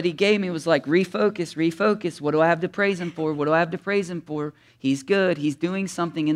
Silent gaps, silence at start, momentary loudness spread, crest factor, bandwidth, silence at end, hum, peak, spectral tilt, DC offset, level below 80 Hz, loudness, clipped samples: none; 0 s; 7 LU; 16 dB; 13 kHz; 0 s; none; -6 dBFS; -6 dB/octave; under 0.1%; -68 dBFS; -23 LUFS; under 0.1%